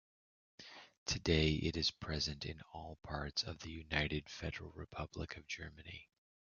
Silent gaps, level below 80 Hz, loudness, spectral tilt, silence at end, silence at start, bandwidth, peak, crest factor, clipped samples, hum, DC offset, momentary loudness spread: 0.98-1.06 s; -52 dBFS; -40 LUFS; -3.5 dB/octave; 0.55 s; 0.6 s; 7 kHz; -16 dBFS; 24 dB; under 0.1%; none; under 0.1%; 18 LU